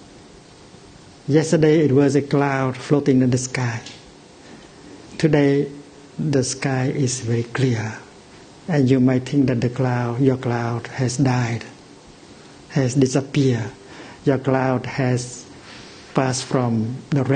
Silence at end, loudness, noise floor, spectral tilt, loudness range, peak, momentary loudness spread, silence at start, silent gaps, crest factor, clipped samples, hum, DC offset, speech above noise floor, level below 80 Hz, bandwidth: 0 s; -20 LUFS; -45 dBFS; -6.5 dB/octave; 4 LU; -2 dBFS; 18 LU; 0.15 s; none; 20 dB; under 0.1%; none; under 0.1%; 26 dB; -52 dBFS; 9.6 kHz